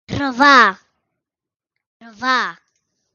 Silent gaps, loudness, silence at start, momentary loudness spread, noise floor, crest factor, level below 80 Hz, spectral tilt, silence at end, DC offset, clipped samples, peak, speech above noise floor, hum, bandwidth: 1.86-2.00 s; -14 LUFS; 0.1 s; 15 LU; -88 dBFS; 18 dB; -50 dBFS; -3.5 dB/octave; 0.65 s; under 0.1%; under 0.1%; 0 dBFS; 74 dB; none; 7.8 kHz